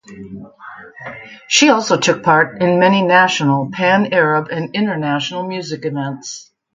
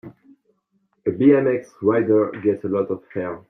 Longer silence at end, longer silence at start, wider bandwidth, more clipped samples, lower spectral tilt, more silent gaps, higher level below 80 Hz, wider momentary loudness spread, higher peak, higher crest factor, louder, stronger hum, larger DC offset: first, 0.35 s vs 0.1 s; about the same, 0.1 s vs 0.05 s; first, 9.6 kHz vs 6.2 kHz; neither; second, -4 dB/octave vs -9.5 dB/octave; neither; about the same, -60 dBFS vs -64 dBFS; first, 22 LU vs 11 LU; first, 0 dBFS vs -4 dBFS; about the same, 16 dB vs 18 dB; first, -15 LUFS vs -20 LUFS; neither; neither